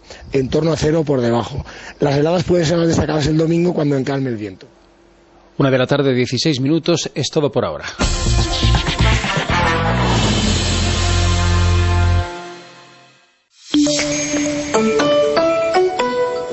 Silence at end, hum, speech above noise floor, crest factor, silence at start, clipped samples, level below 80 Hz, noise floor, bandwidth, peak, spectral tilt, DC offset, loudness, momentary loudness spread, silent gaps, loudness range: 0 s; none; 37 dB; 14 dB; 0.1 s; under 0.1%; -28 dBFS; -53 dBFS; 8.4 kHz; -2 dBFS; -5 dB/octave; under 0.1%; -17 LUFS; 6 LU; none; 3 LU